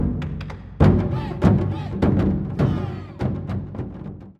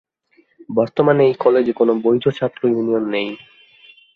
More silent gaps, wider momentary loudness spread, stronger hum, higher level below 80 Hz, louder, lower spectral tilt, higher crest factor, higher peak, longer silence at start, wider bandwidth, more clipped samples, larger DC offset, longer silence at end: neither; first, 15 LU vs 9 LU; neither; first, -32 dBFS vs -62 dBFS; second, -22 LUFS vs -17 LUFS; about the same, -9.5 dB/octave vs -8.5 dB/octave; about the same, 20 dB vs 16 dB; about the same, -2 dBFS vs -2 dBFS; second, 0 s vs 0.7 s; first, 7.2 kHz vs 6.4 kHz; neither; neither; second, 0.1 s vs 0.8 s